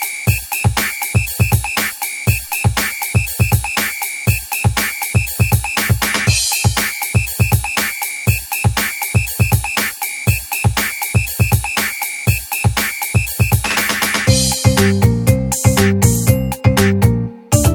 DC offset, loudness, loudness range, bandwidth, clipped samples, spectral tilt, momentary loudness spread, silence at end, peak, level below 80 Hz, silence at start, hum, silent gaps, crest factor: under 0.1%; -15 LUFS; 3 LU; 19.5 kHz; under 0.1%; -4 dB/octave; 5 LU; 0 s; 0 dBFS; -28 dBFS; 0 s; none; none; 16 dB